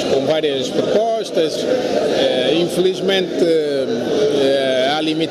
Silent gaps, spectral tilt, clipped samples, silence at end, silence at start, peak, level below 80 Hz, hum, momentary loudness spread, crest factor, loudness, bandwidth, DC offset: none; -4.5 dB/octave; under 0.1%; 0 s; 0 s; -4 dBFS; -56 dBFS; none; 3 LU; 12 dB; -17 LUFS; 13.5 kHz; under 0.1%